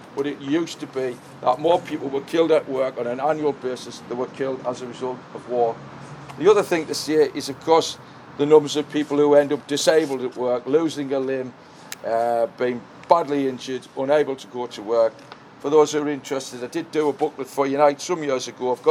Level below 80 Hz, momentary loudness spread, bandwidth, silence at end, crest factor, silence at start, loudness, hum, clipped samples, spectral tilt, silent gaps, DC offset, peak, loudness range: -68 dBFS; 13 LU; 16.5 kHz; 0 s; 22 dB; 0 s; -22 LUFS; none; under 0.1%; -4.5 dB/octave; none; under 0.1%; 0 dBFS; 5 LU